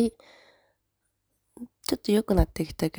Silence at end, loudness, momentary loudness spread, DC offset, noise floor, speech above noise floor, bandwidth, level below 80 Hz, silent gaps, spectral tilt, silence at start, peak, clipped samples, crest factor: 0 s; -27 LUFS; 20 LU; under 0.1%; -78 dBFS; 52 dB; over 20 kHz; -38 dBFS; none; -6 dB/octave; 0 s; -8 dBFS; under 0.1%; 22 dB